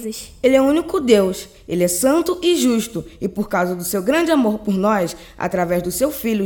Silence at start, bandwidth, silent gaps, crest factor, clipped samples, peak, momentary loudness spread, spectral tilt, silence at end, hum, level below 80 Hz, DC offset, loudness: 0 s; 17.5 kHz; none; 18 dB; under 0.1%; 0 dBFS; 11 LU; -4.5 dB/octave; 0 s; none; -46 dBFS; under 0.1%; -18 LUFS